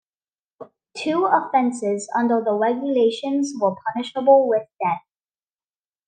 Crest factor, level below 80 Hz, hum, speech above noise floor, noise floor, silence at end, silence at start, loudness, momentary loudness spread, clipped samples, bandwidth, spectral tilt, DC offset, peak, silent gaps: 18 dB; -76 dBFS; none; over 70 dB; under -90 dBFS; 1.1 s; 0.6 s; -21 LUFS; 10 LU; under 0.1%; 9.6 kHz; -5 dB/octave; under 0.1%; -4 dBFS; none